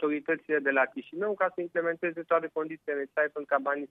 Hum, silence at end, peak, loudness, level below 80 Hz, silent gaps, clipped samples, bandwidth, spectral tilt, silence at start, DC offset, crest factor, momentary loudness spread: none; 0.05 s; -10 dBFS; -30 LUFS; -84 dBFS; none; under 0.1%; 3.9 kHz; -8 dB/octave; 0 s; under 0.1%; 20 dB; 7 LU